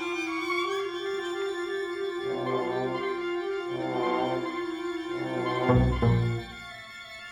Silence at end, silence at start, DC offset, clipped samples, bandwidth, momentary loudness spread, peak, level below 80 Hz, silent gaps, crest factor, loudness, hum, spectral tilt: 0 s; 0 s; under 0.1%; under 0.1%; 12.5 kHz; 9 LU; -10 dBFS; -42 dBFS; none; 20 dB; -29 LUFS; none; -6.5 dB/octave